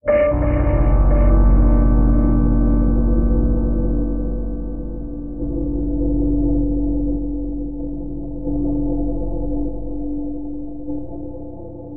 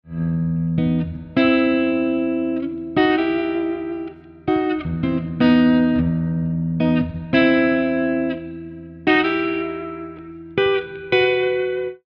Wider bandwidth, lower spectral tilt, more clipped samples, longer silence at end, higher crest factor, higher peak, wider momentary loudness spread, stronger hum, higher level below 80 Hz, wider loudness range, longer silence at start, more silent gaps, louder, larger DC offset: second, 2.8 kHz vs 5.6 kHz; first, -13 dB/octave vs -9 dB/octave; neither; second, 0 s vs 0.15 s; about the same, 14 dB vs 18 dB; about the same, -4 dBFS vs -2 dBFS; about the same, 13 LU vs 13 LU; neither; first, -20 dBFS vs -46 dBFS; first, 8 LU vs 4 LU; about the same, 0 s vs 0.05 s; neither; about the same, -20 LUFS vs -20 LUFS; first, 3% vs under 0.1%